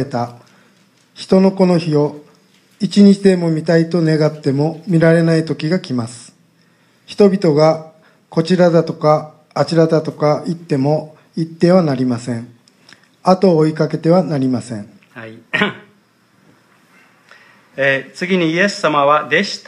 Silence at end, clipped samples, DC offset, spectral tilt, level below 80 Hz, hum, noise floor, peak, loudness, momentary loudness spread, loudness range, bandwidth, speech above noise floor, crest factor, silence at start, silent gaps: 0.05 s; under 0.1%; under 0.1%; -7 dB/octave; -62 dBFS; none; -54 dBFS; 0 dBFS; -15 LUFS; 14 LU; 6 LU; 11 kHz; 40 dB; 16 dB; 0 s; none